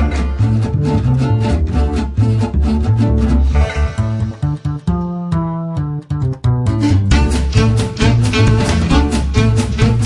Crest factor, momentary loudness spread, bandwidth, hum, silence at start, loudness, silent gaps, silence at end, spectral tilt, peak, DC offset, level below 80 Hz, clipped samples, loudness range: 14 dB; 7 LU; 11.5 kHz; none; 0 s; -15 LUFS; none; 0 s; -7 dB/octave; 0 dBFS; under 0.1%; -20 dBFS; under 0.1%; 4 LU